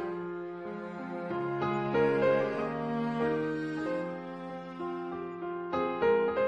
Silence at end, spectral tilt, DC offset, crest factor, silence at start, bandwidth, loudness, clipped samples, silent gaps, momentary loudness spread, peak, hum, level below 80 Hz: 0 s; -8 dB/octave; under 0.1%; 16 dB; 0 s; 8.2 kHz; -32 LUFS; under 0.1%; none; 13 LU; -16 dBFS; none; -70 dBFS